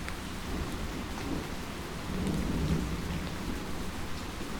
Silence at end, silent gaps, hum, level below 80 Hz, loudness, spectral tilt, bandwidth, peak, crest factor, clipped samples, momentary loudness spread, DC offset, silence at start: 0 s; none; none; -40 dBFS; -36 LUFS; -5.5 dB/octave; over 20 kHz; -16 dBFS; 18 dB; under 0.1%; 7 LU; under 0.1%; 0 s